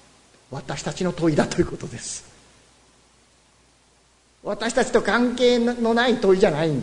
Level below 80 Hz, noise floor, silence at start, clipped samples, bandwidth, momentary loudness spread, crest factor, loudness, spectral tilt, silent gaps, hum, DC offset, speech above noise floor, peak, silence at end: -48 dBFS; -59 dBFS; 0.5 s; under 0.1%; 11 kHz; 14 LU; 18 dB; -21 LUFS; -5 dB/octave; none; none; under 0.1%; 38 dB; -4 dBFS; 0 s